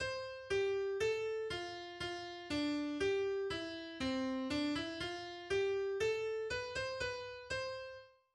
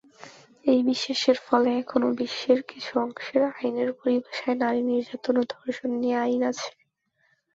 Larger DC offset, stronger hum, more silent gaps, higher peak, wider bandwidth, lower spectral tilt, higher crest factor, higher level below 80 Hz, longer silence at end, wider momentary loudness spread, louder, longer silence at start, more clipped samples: neither; neither; neither; second, -26 dBFS vs -6 dBFS; first, 11.5 kHz vs 7.8 kHz; about the same, -4 dB/octave vs -4 dB/octave; second, 14 dB vs 20 dB; first, -64 dBFS vs -70 dBFS; second, 0.25 s vs 0.85 s; about the same, 8 LU vs 7 LU; second, -39 LUFS vs -25 LUFS; second, 0 s vs 0.2 s; neither